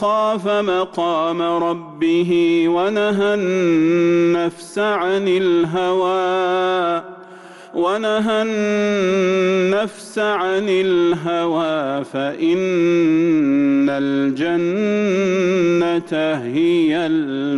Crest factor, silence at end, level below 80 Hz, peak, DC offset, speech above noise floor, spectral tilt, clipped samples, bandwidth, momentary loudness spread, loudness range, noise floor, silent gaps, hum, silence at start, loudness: 8 dB; 0 s; -60 dBFS; -8 dBFS; under 0.1%; 22 dB; -6 dB/octave; under 0.1%; 11.5 kHz; 5 LU; 2 LU; -39 dBFS; none; none; 0 s; -18 LUFS